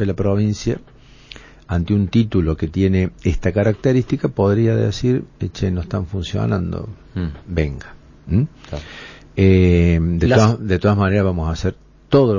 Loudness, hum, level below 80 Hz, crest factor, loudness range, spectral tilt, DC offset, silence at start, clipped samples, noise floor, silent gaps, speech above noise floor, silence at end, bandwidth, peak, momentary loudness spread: -18 LUFS; none; -30 dBFS; 16 dB; 7 LU; -7.5 dB/octave; under 0.1%; 0 s; under 0.1%; -41 dBFS; none; 24 dB; 0 s; 7.4 kHz; -2 dBFS; 14 LU